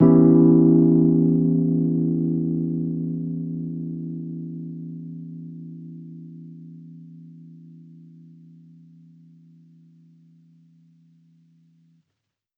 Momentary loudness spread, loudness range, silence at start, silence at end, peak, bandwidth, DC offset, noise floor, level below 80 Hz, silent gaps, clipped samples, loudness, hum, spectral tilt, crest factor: 27 LU; 26 LU; 0 s; 5.15 s; -4 dBFS; 2.1 kHz; under 0.1%; -80 dBFS; -58 dBFS; none; under 0.1%; -20 LUFS; none; -15 dB/octave; 18 dB